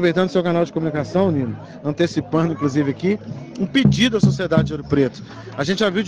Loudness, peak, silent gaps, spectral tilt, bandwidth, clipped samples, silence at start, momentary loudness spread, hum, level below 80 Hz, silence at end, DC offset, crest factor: -20 LUFS; -2 dBFS; none; -6.5 dB/octave; 9.6 kHz; under 0.1%; 0 s; 11 LU; none; -46 dBFS; 0 s; under 0.1%; 16 dB